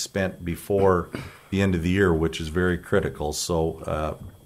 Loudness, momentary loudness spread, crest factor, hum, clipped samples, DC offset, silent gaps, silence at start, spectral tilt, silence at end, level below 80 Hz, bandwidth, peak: -25 LUFS; 9 LU; 18 dB; none; under 0.1%; under 0.1%; none; 0 s; -5.5 dB/octave; 0.1 s; -40 dBFS; 16 kHz; -6 dBFS